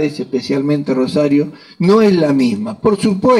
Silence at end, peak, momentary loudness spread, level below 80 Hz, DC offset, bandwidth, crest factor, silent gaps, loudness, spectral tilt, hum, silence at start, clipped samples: 0 s; -2 dBFS; 7 LU; -54 dBFS; under 0.1%; 12 kHz; 12 dB; none; -15 LUFS; -7 dB/octave; none; 0 s; under 0.1%